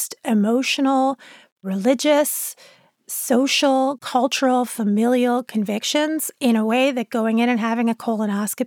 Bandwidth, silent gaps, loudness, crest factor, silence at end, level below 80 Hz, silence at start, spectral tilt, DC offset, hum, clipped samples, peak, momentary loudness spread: 19 kHz; 1.52-1.56 s; -20 LUFS; 16 dB; 0 s; -80 dBFS; 0 s; -4 dB/octave; under 0.1%; none; under 0.1%; -4 dBFS; 6 LU